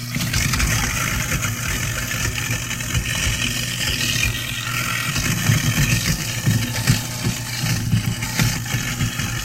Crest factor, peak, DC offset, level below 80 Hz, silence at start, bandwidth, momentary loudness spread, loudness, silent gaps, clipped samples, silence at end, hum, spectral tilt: 18 dB; -2 dBFS; under 0.1%; -32 dBFS; 0 s; 16 kHz; 4 LU; -20 LUFS; none; under 0.1%; 0 s; none; -3 dB/octave